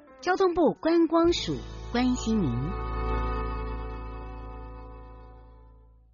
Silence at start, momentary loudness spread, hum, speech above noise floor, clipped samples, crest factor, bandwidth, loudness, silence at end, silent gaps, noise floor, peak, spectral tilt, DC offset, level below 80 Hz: 0.1 s; 20 LU; none; 29 dB; under 0.1%; 16 dB; 7.2 kHz; -27 LUFS; 0.45 s; none; -54 dBFS; -12 dBFS; -5.5 dB/octave; under 0.1%; -38 dBFS